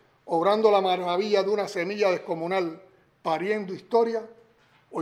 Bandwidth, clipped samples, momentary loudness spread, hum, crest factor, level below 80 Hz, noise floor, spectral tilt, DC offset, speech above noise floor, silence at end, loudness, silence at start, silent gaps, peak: 12 kHz; under 0.1%; 9 LU; none; 20 dB; -78 dBFS; -60 dBFS; -5.5 dB/octave; under 0.1%; 36 dB; 0 s; -25 LUFS; 0.25 s; none; -6 dBFS